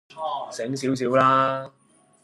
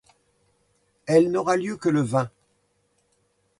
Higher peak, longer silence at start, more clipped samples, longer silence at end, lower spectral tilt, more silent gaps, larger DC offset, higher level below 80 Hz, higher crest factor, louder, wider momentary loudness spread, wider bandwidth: about the same, -6 dBFS vs -6 dBFS; second, 0.15 s vs 1.05 s; neither; second, 0.55 s vs 1.3 s; about the same, -5.5 dB/octave vs -6.5 dB/octave; neither; neither; about the same, -70 dBFS vs -66 dBFS; about the same, 18 dB vs 20 dB; about the same, -23 LUFS vs -23 LUFS; about the same, 13 LU vs 11 LU; about the same, 12.5 kHz vs 11.5 kHz